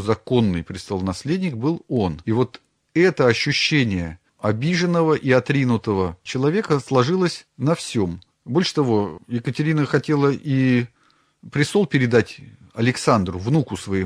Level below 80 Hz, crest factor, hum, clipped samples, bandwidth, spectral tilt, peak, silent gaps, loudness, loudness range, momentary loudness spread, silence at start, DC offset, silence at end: -52 dBFS; 18 dB; none; under 0.1%; 12.5 kHz; -6 dB/octave; -2 dBFS; none; -21 LUFS; 2 LU; 9 LU; 0 s; under 0.1%; 0 s